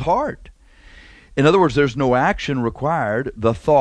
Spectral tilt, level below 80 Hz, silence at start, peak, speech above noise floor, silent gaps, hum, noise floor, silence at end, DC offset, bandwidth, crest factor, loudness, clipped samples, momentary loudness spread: -6.5 dB/octave; -40 dBFS; 0 s; 0 dBFS; 28 dB; none; none; -45 dBFS; 0 s; under 0.1%; 10.5 kHz; 18 dB; -19 LUFS; under 0.1%; 9 LU